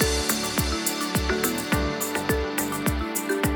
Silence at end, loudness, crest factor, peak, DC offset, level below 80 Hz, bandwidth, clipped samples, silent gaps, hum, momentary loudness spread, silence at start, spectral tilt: 0 s; -25 LUFS; 18 dB; -6 dBFS; under 0.1%; -34 dBFS; over 20 kHz; under 0.1%; none; none; 3 LU; 0 s; -3.5 dB/octave